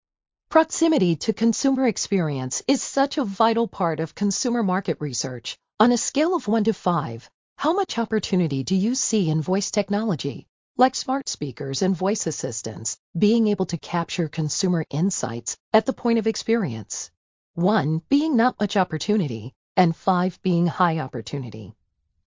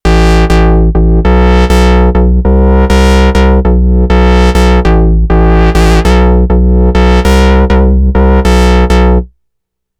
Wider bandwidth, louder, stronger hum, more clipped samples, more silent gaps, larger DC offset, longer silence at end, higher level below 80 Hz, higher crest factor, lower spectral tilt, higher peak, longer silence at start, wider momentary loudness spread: second, 7.8 kHz vs 11 kHz; second, -23 LUFS vs -7 LUFS; neither; neither; first, 7.34-7.56 s, 10.49-10.75 s, 12.99-13.14 s, 15.60-15.72 s, 17.17-17.54 s, 19.56-19.75 s vs none; neither; second, 0.55 s vs 0.75 s; second, -62 dBFS vs -8 dBFS; first, 20 dB vs 6 dB; second, -5 dB/octave vs -7 dB/octave; about the same, -2 dBFS vs 0 dBFS; first, 0.5 s vs 0.05 s; first, 9 LU vs 2 LU